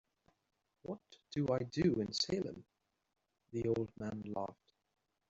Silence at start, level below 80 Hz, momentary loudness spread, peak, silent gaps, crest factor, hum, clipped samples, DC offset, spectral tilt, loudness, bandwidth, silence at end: 0.85 s; -68 dBFS; 14 LU; -22 dBFS; none; 18 dB; none; under 0.1%; under 0.1%; -5.5 dB/octave; -39 LUFS; 8 kHz; 0.75 s